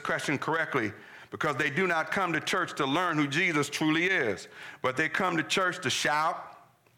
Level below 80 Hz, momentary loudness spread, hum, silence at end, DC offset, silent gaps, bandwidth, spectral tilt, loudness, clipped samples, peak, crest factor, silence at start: -72 dBFS; 9 LU; none; 0.4 s; under 0.1%; none; 17.5 kHz; -4 dB/octave; -28 LUFS; under 0.1%; -16 dBFS; 12 dB; 0 s